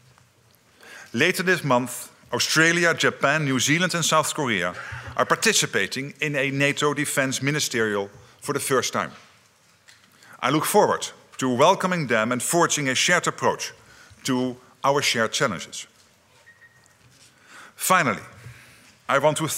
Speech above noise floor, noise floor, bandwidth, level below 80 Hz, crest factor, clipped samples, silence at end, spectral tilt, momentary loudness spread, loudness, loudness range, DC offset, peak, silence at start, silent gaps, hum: 36 dB; -58 dBFS; 16 kHz; -66 dBFS; 20 dB; under 0.1%; 0 s; -3 dB/octave; 13 LU; -22 LUFS; 6 LU; under 0.1%; -4 dBFS; 0.85 s; none; none